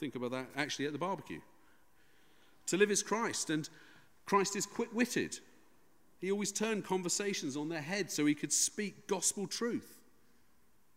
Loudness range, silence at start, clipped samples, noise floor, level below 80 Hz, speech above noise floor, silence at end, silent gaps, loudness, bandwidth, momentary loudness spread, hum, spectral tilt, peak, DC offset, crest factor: 3 LU; 0 s; under 0.1%; -72 dBFS; -78 dBFS; 37 dB; 1 s; none; -35 LUFS; 16 kHz; 12 LU; none; -3 dB/octave; -16 dBFS; under 0.1%; 20 dB